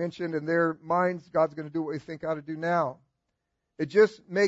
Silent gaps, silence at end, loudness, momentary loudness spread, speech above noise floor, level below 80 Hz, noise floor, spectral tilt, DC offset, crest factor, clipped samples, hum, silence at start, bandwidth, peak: none; 0 s; -28 LUFS; 10 LU; 54 dB; -72 dBFS; -81 dBFS; -6.5 dB/octave; under 0.1%; 18 dB; under 0.1%; none; 0 s; 8 kHz; -10 dBFS